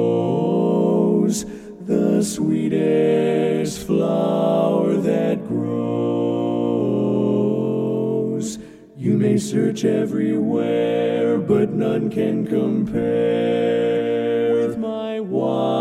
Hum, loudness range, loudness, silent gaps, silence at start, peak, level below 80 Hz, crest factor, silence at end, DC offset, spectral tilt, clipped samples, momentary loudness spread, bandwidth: none; 2 LU; -20 LUFS; none; 0 s; -6 dBFS; -56 dBFS; 14 dB; 0 s; under 0.1%; -7 dB/octave; under 0.1%; 5 LU; 14.5 kHz